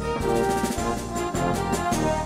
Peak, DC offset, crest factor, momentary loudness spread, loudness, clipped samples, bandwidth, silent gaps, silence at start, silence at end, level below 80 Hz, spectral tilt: -10 dBFS; 0.1%; 14 dB; 4 LU; -25 LUFS; under 0.1%; 16 kHz; none; 0 s; 0 s; -38 dBFS; -5 dB/octave